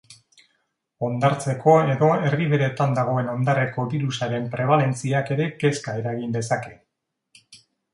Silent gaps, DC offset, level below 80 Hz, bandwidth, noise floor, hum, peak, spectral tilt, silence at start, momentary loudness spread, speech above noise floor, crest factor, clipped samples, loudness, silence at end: none; under 0.1%; -62 dBFS; 11.5 kHz; -80 dBFS; none; -4 dBFS; -6.5 dB/octave; 0.1 s; 10 LU; 58 dB; 20 dB; under 0.1%; -22 LUFS; 0.4 s